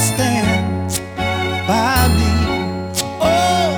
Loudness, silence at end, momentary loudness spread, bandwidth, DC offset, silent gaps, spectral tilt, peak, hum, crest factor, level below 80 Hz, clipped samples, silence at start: -17 LUFS; 0 s; 7 LU; over 20 kHz; under 0.1%; none; -4.5 dB/octave; 0 dBFS; none; 16 dB; -28 dBFS; under 0.1%; 0 s